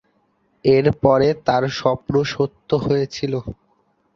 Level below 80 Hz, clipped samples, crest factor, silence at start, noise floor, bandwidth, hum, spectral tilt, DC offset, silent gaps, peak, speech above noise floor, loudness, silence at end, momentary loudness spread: -46 dBFS; under 0.1%; 18 dB; 0.65 s; -64 dBFS; 7.2 kHz; none; -7 dB/octave; under 0.1%; none; -2 dBFS; 45 dB; -19 LUFS; 0.6 s; 9 LU